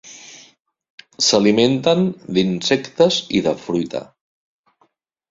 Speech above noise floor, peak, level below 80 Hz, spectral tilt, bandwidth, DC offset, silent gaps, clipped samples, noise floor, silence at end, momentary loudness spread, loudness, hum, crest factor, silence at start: 46 dB; -2 dBFS; -56 dBFS; -4.5 dB/octave; 7.8 kHz; under 0.1%; 0.60-0.65 s, 0.90-0.98 s; under 0.1%; -63 dBFS; 1.25 s; 12 LU; -17 LUFS; none; 18 dB; 0.05 s